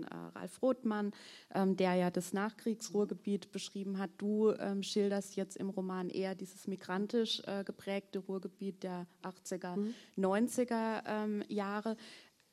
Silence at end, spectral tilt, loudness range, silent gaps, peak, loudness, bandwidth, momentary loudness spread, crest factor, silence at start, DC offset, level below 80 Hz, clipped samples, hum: 0.3 s; -5.5 dB/octave; 4 LU; none; -20 dBFS; -37 LUFS; 14 kHz; 11 LU; 18 dB; 0 s; under 0.1%; -86 dBFS; under 0.1%; none